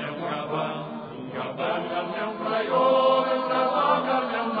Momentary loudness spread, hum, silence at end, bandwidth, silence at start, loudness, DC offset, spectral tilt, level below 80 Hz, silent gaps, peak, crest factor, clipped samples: 12 LU; none; 0 s; 5 kHz; 0 s; -25 LUFS; under 0.1%; -8 dB/octave; -68 dBFS; none; -8 dBFS; 16 dB; under 0.1%